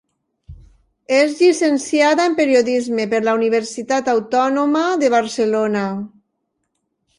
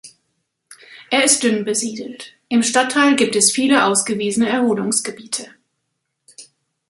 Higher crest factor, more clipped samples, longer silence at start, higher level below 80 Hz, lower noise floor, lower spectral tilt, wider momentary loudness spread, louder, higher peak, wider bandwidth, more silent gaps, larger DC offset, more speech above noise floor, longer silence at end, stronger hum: about the same, 16 dB vs 20 dB; neither; first, 0.5 s vs 0.05 s; first, -54 dBFS vs -66 dBFS; about the same, -72 dBFS vs -74 dBFS; first, -4 dB/octave vs -2 dB/octave; second, 6 LU vs 13 LU; about the same, -17 LUFS vs -16 LUFS; about the same, -2 dBFS vs 0 dBFS; about the same, 11.5 kHz vs 12 kHz; neither; neither; about the same, 56 dB vs 57 dB; first, 1.1 s vs 0.45 s; neither